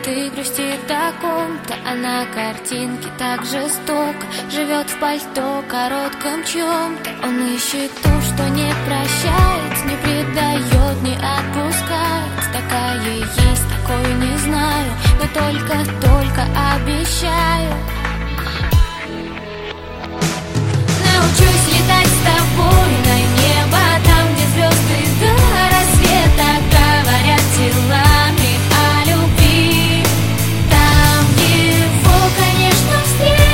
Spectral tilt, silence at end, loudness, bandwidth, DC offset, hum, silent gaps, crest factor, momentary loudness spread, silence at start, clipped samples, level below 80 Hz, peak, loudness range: -4.5 dB/octave; 0 s; -15 LUFS; 16.5 kHz; under 0.1%; none; none; 14 dB; 10 LU; 0 s; under 0.1%; -22 dBFS; 0 dBFS; 8 LU